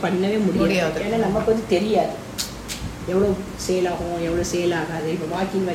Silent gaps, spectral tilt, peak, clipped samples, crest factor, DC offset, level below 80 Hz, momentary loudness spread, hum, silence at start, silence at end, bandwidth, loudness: none; -5.5 dB/octave; -4 dBFS; under 0.1%; 18 dB; under 0.1%; -42 dBFS; 8 LU; none; 0 s; 0 s; 16 kHz; -22 LUFS